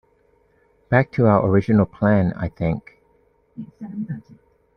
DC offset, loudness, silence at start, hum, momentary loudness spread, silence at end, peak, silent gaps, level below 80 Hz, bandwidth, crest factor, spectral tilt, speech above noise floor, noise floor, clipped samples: under 0.1%; -20 LUFS; 0.9 s; none; 18 LU; 0.55 s; -4 dBFS; none; -48 dBFS; 5.8 kHz; 18 dB; -10.5 dB/octave; 41 dB; -60 dBFS; under 0.1%